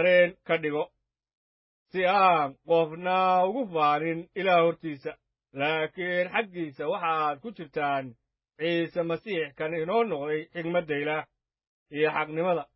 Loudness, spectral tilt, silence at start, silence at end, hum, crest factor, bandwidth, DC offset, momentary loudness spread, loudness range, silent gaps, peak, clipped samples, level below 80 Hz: -27 LUFS; -9.5 dB/octave; 0 s; 0.1 s; none; 18 dB; 5.8 kHz; under 0.1%; 12 LU; 5 LU; 1.37-1.86 s, 11.67-11.86 s; -10 dBFS; under 0.1%; -72 dBFS